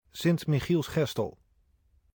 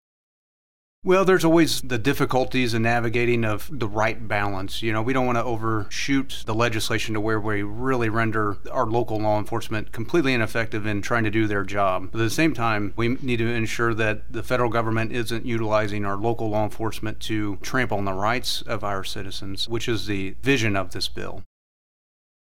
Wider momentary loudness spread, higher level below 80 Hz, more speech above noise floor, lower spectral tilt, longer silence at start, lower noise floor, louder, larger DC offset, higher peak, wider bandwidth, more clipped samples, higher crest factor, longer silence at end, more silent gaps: about the same, 7 LU vs 7 LU; second, -56 dBFS vs -44 dBFS; second, 40 dB vs over 66 dB; about the same, -6.5 dB/octave vs -5.5 dB/octave; second, 0.15 s vs 1 s; second, -67 dBFS vs under -90 dBFS; second, -29 LUFS vs -24 LUFS; second, under 0.1% vs 5%; second, -14 dBFS vs -6 dBFS; first, 19.5 kHz vs 16 kHz; neither; about the same, 16 dB vs 18 dB; second, 0.85 s vs 1 s; neither